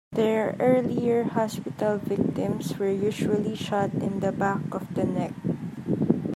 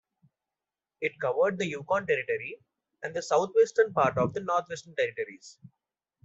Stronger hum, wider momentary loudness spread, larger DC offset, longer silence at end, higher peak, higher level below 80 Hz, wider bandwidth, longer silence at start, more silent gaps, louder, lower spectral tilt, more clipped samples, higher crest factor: neither; second, 7 LU vs 14 LU; neither; second, 0 s vs 0.75 s; first, -6 dBFS vs -12 dBFS; first, -62 dBFS vs -68 dBFS; first, 15.5 kHz vs 8 kHz; second, 0.1 s vs 1 s; neither; about the same, -26 LUFS vs -28 LUFS; first, -7 dB/octave vs -5 dB/octave; neither; about the same, 20 dB vs 18 dB